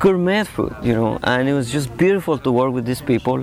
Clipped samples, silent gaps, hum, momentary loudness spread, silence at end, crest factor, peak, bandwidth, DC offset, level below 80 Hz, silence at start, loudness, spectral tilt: under 0.1%; none; none; 5 LU; 0 s; 12 dB; -6 dBFS; 16 kHz; under 0.1%; -44 dBFS; 0 s; -19 LUFS; -6.5 dB/octave